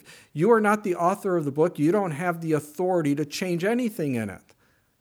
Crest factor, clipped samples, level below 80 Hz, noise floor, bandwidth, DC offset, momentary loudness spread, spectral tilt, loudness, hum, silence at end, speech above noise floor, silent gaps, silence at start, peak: 18 dB; under 0.1%; -72 dBFS; -63 dBFS; over 20 kHz; under 0.1%; 8 LU; -6.5 dB/octave; -24 LUFS; none; 0.65 s; 39 dB; none; 0.1 s; -8 dBFS